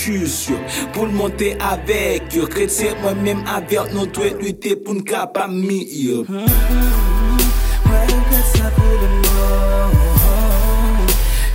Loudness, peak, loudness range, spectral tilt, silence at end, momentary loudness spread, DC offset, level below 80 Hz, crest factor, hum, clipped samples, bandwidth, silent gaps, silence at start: -17 LUFS; -2 dBFS; 4 LU; -5 dB/octave; 0 s; 6 LU; under 0.1%; -16 dBFS; 14 dB; none; under 0.1%; 16.5 kHz; none; 0 s